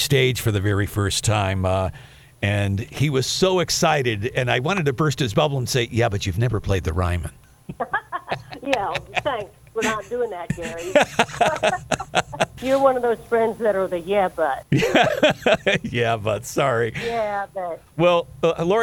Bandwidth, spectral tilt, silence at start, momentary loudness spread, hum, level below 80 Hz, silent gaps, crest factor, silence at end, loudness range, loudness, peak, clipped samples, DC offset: 19 kHz; -5 dB/octave; 0 s; 9 LU; none; -44 dBFS; none; 20 dB; 0 s; 5 LU; -22 LUFS; 0 dBFS; under 0.1%; under 0.1%